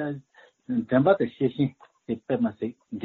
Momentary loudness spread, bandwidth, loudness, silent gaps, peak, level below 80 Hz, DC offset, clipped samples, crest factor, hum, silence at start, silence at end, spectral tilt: 13 LU; 4.2 kHz; -26 LUFS; none; -8 dBFS; -64 dBFS; under 0.1%; under 0.1%; 20 dB; none; 0 s; 0 s; -7 dB/octave